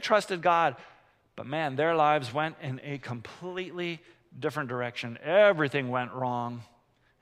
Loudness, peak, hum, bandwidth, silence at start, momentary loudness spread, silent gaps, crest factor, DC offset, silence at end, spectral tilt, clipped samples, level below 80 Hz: -28 LUFS; -8 dBFS; none; 12.5 kHz; 0 s; 15 LU; none; 20 dB; under 0.1%; 0.6 s; -5.5 dB/octave; under 0.1%; -72 dBFS